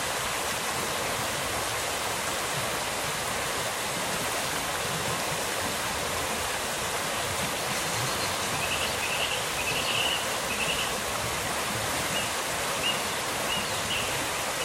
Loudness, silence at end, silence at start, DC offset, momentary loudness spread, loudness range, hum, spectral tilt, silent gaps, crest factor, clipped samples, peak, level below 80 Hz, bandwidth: -28 LUFS; 0 s; 0 s; under 0.1%; 2 LU; 2 LU; none; -1.5 dB/octave; none; 16 dB; under 0.1%; -14 dBFS; -52 dBFS; 16 kHz